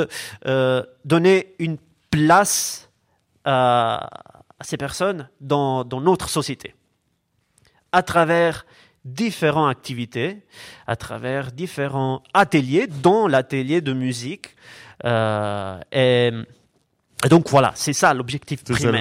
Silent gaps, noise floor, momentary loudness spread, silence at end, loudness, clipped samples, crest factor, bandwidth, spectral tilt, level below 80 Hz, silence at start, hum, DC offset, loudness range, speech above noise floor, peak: none; -69 dBFS; 16 LU; 0 s; -20 LUFS; under 0.1%; 18 dB; 16 kHz; -5 dB/octave; -52 dBFS; 0 s; none; under 0.1%; 5 LU; 49 dB; -4 dBFS